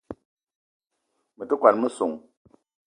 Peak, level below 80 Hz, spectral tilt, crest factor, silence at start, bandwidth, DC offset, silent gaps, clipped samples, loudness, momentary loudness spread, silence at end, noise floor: -2 dBFS; -68 dBFS; -5.5 dB/octave; 26 dB; 0.1 s; 10 kHz; under 0.1%; 0.25-0.37 s, 0.55-0.80 s; under 0.1%; -23 LUFS; 24 LU; 0.7 s; -76 dBFS